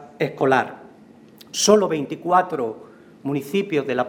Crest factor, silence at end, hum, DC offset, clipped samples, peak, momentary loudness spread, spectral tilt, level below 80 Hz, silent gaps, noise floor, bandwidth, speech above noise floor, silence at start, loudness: 22 dB; 0 s; none; under 0.1%; under 0.1%; 0 dBFS; 14 LU; -4 dB/octave; -66 dBFS; none; -47 dBFS; over 20 kHz; 27 dB; 0 s; -21 LUFS